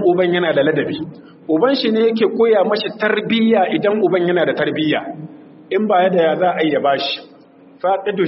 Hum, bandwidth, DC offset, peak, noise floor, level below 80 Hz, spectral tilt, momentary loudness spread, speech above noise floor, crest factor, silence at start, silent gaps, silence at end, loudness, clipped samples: none; 6 kHz; under 0.1%; -2 dBFS; -44 dBFS; -64 dBFS; -3.5 dB/octave; 9 LU; 29 dB; 14 dB; 0 s; none; 0 s; -16 LUFS; under 0.1%